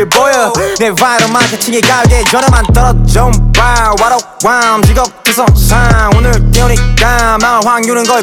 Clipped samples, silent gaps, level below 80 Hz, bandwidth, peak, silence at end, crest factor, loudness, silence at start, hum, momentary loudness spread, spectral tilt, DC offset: 0.3%; none; -12 dBFS; 18 kHz; 0 dBFS; 0 s; 8 dB; -8 LUFS; 0 s; none; 3 LU; -4 dB/octave; under 0.1%